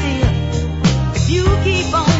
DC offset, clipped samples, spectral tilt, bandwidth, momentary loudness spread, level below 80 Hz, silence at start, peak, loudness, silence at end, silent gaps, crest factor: under 0.1%; under 0.1%; -5.5 dB/octave; 8 kHz; 3 LU; -22 dBFS; 0 s; -2 dBFS; -16 LUFS; 0 s; none; 14 dB